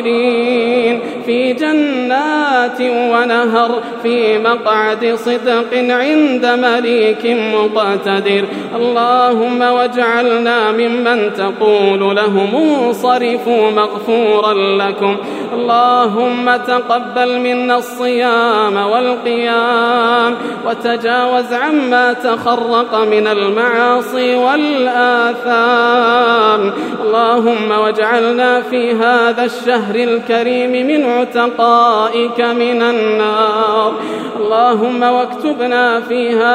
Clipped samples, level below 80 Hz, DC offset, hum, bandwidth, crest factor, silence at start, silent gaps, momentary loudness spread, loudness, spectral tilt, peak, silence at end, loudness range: under 0.1%; -72 dBFS; under 0.1%; none; 15 kHz; 12 dB; 0 s; none; 4 LU; -13 LUFS; -5 dB/octave; 0 dBFS; 0 s; 2 LU